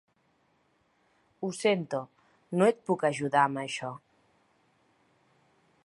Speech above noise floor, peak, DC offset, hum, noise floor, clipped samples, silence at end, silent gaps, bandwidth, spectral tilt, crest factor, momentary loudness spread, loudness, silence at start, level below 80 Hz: 42 dB; -10 dBFS; under 0.1%; none; -71 dBFS; under 0.1%; 1.9 s; none; 11.5 kHz; -5.5 dB/octave; 22 dB; 13 LU; -29 LUFS; 1.4 s; -78 dBFS